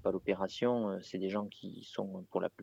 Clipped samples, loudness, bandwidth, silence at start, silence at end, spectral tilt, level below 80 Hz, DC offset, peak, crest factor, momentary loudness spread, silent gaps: under 0.1%; -37 LUFS; 8 kHz; 0.05 s; 0 s; -6.5 dB/octave; -70 dBFS; under 0.1%; -18 dBFS; 18 dB; 10 LU; none